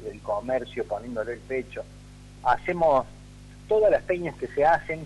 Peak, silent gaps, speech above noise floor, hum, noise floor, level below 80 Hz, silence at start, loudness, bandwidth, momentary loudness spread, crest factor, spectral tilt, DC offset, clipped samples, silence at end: -12 dBFS; none; 20 dB; 50 Hz at -45 dBFS; -46 dBFS; -48 dBFS; 0 s; -26 LUFS; 11.5 kHz; 10 LU; 16 dB; -6.5 dB/octave; under 0.1%; under 0.1%; 0 s